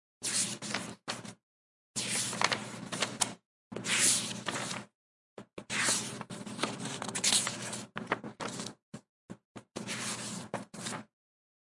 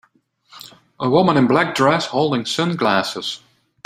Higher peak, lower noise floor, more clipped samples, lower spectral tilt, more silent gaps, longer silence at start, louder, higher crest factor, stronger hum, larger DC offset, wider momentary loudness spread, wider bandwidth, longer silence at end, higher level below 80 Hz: second, -8 dBFS vs -2 dBFS; first, under -90 dBFS vs -57 dBFS; neither; second, -1.5 dB/octave vs -5 dB/octave; first, 1.43-1.94 s, 3.46-3.71 s, 4.95-5.36 s, 8.83-8.92 s, 9.09-9.29 s, 9.45-9.55 s vs none; second, 0.2 s vs 0.55 s; second, -33 LUFS vs -18 LUFS; first, 28 dB vs 18 dB; neither; neither; first, 22 LU vs 11 LU; second, 11.5 kHz vs 16 kHz; first, 0.65 s vs 0.5 s; second, -76 dBFS vs -60 dBFS